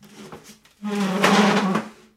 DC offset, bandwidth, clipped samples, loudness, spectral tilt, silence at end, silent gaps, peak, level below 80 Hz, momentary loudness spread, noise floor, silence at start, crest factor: under 0.1%; 15 kHz; under 0.1%; -20 LUFS; -5 dB/octave; 0.25 s; none; -4 dBFS; -68 dBFS; 22 LU; -45 dBFS; 0.15 s; 18 dB